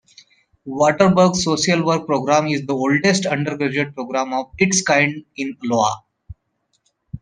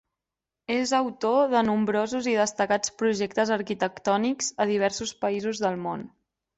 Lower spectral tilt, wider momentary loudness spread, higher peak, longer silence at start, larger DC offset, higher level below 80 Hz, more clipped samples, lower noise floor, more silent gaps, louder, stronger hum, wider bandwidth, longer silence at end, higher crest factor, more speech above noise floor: about the same, -4.5 dB/octave vs -4 dB/octave; first, 10 LU vs 6 LU; first, -2 dBFS vs -10 dBFS; about the same, 0.65 s vs 0.7 s; neither; first, -52 dBFS vs -66 dBFS; neither; second, -69 dBFS vs -88 dBFS; neither; first, -18 LUFS vs -26 LUFS; neither; first, 10.5 kHz vs 8.4 kHz; second, 0.05 s vs 0.5 s; about the same, 18 dB vs 16 dB; second, 51 dB vs 63 dB